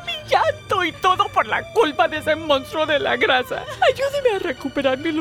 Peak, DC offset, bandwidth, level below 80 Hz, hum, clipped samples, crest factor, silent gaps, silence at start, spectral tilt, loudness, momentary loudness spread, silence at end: -6 dBFS; under 0.1%; 19.5 kHz; -50 dBFS; none; under 0.1%; 14 dB; none; 0 s; -4 dB/octave; -20 LUFS; 4 LU; 0 s